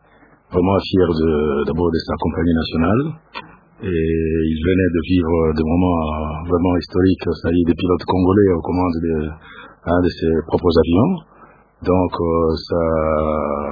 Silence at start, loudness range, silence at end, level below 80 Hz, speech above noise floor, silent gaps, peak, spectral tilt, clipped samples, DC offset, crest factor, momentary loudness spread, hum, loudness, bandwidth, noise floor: 0.5 s; 2 LU; 0 s; -34 dBFS; 34 dB; none; 0 dBFS; -9.5 dB/octave; under 0.1%; under 0.1%; 16 dB; 8 LU; none; -18 LUFS; 5 kHz; -51 dBFS